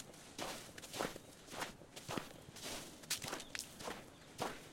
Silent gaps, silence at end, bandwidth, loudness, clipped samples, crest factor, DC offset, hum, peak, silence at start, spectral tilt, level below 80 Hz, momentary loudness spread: none; 0 s; 16.5 kHz; -46 LUFS; under 0.1%; 26 dB; under 0.1%; none; -22 dBFS; 0 s; -2.5 dB/octave; -68 dBFS; 10 LU